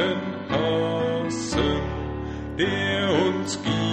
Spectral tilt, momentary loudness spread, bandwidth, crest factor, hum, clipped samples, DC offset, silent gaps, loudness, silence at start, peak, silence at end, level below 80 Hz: -5 dB/octave; 8 LU; 11 kHz; 16 dB; none; under 0.1%; under 0.1%; none; -25 LUFS; 0 s; -10 dBFS; 0 s; -40 dBFS